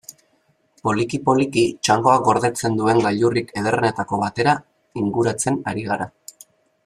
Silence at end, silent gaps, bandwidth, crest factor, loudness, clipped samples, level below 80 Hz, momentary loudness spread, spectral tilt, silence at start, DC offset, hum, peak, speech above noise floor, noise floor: 0.8 s; none; 14.5 kHz; 18 dB; -20 LUFS; under 0.1%; -56 dBFS; 9 LU; -5 dB/octave; 0.1 s; under 0.1%; none; -2 dBFS; 44 dB; -63 dBFS